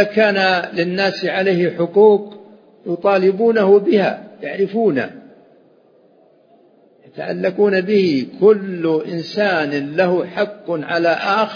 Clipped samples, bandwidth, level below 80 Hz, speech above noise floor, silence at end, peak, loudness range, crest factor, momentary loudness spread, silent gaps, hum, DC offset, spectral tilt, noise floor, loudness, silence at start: under 0.1%; 5.2 kHz; -70 dBFS; 36 dB; 0 s; 0 dBFS; 7 LU; 16 dB; 11 LU; none; none; under 0.1%; -7 dB/octave; -52 dBFS; -16 LUFS; 0 s